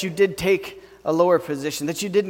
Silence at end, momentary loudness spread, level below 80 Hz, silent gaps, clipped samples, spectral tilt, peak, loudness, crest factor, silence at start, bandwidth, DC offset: 0 s; 9 LU; -54 dBFS; none; under 0.1%; -5 dB/octave; -4 dBFS; -22 LUFS; 16 dB; 0 s; 17 kHz; under 0.1%